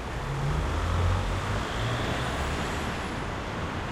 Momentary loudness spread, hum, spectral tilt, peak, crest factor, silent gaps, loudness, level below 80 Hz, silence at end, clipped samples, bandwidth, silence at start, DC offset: 5 LU; none; -5.5 dB/octave; -16 dBFS; 14 dB; none; -30 LUFS; -36 dBFS; 0 s; under 0.1%; 15.5 kHz; 0 s; under 0.1%